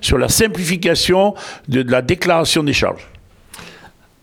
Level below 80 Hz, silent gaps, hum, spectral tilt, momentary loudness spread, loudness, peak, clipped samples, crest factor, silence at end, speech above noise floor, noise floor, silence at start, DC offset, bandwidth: -34 dBFS; none; none; -4 dB/octave; 16 LU; -15 LUFS; -2 dBFS; under 0.1%; 16 dB; 0.35 s; 29 dB; -44 dBFS; 0 s; under 0.1%; 20 kHz